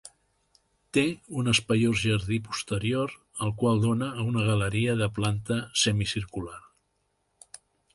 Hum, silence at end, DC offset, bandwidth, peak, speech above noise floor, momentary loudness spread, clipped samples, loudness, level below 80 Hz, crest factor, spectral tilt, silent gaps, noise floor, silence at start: 50 Hz at -50 dBFS; 1.35 s; under 0.1%; 11.5 kHz; -10 dBFS; 48 dB; 9 LU; under 0.1%; -27 LUFS; -52 dBFS; 18 dB; -5 dB/octave; none; -74 dBFS; 0.05 s